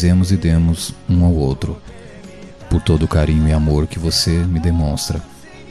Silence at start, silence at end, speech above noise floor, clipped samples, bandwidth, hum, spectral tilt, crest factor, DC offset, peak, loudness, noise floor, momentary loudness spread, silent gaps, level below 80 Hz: 0 s; 0 s; 21 dB; under 0.1%; 13.5 kHz; none; -6 dB/octave; 14 dB; 0.6%; -2 dBFS; -17 LUFS; -36 dBFS; 21 LU; none; -26 dBFS